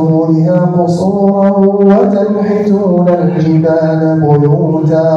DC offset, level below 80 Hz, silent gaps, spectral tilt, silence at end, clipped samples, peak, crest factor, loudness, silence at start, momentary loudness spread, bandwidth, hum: under 0.1%; -50 dBFS; none; -10 dB/octave; 0 s; under 0.1%; 0 dBFS; 8 dB; -10 LUFS; 0 s; 3 LU; 8 kHz; none